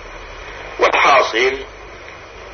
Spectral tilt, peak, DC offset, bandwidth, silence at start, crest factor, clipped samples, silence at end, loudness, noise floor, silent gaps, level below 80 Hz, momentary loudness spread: -2.5 dB/octave; 0 dBFS; under 0.1%; 6.6 kHz; 0 s; 18 dB; under 0.1%; 0 s; -14 LUFS; -35 dBFS; none; -42 dBFS; 23 LU